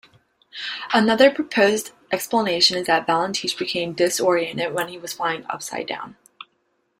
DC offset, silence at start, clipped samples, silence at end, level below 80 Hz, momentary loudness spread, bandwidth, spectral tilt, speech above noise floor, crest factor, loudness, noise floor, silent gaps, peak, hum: under 0.1%; 0.55 s; under 0.1%; 0.85 s; -66 dBFS; 13 LU; 16 kHz; -3 dB/octave; 48 dB; 20 dB; -21 LUFS; -69 dBFS; none; -2 dBFS; none